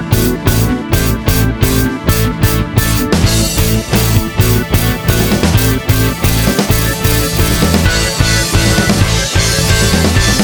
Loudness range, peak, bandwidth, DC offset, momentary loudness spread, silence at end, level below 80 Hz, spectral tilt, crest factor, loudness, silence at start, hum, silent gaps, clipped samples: 1 LU; 0 dBFS; over 20 kHz; under 0.1%; 3 LU; 0 s; -18 dBFS; -4.5 dB/octave; 12 dB; -12 LUFS; 0 s; none; none; under 0.1%